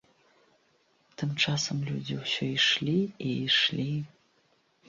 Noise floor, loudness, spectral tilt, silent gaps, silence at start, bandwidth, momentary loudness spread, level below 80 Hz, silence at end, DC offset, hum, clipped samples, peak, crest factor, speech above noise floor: -69 dBFS; -28 LUFS; -4 dB/octave; none; 1.2 s; 7.6 kHz; 10 LU; -68 dBFS; 0.8 s; under 0.1%; none; under 0.1%; -12 dBFS; 20 dB; 40 dB